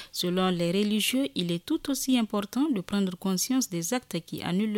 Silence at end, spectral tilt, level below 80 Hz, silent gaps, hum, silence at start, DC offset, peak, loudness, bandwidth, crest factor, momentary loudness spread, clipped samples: 0 s; -4.5 dB/octave; -62 dBFS; none; none; 0 s; under 0.1%; -12 dBFS; -28 LUFS; 17 kHz; 14 dB; 5 LU; under 0.1%